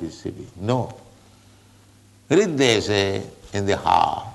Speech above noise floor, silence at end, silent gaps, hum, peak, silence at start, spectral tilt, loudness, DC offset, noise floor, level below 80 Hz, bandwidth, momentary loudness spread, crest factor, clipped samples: 31 dB; 0 s; none; none; -4 dBFS; 0 s; -4.5 dB/octave; -21 LUFS; under 0.1%; -52 dBFS; -52 dBFS; 12 kHz; 15 LU; 20 dB; under 0.1%